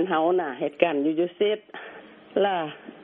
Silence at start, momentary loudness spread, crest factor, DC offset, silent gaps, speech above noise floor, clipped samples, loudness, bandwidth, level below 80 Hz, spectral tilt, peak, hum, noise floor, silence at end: 0 s; 15 LU; 22 dB; under 0.1%; none; 20 dB; under 0.1%; -25 LUFS; 3.8 kHz; -74 dBFS; -3.5 dB/octave; -4 dBFS; none; -45 dBFS; 0 s